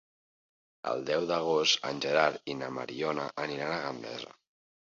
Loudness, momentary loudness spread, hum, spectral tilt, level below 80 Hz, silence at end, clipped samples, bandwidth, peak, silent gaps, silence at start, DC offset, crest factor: -31 LUFS; 14 LU; none; -3 dB/octave; -74 dBFS; 0.55 s; under 0.1%; 7.8 kHz; -10 dBFS; none; 0.85 s; under 0.1%; 22 dB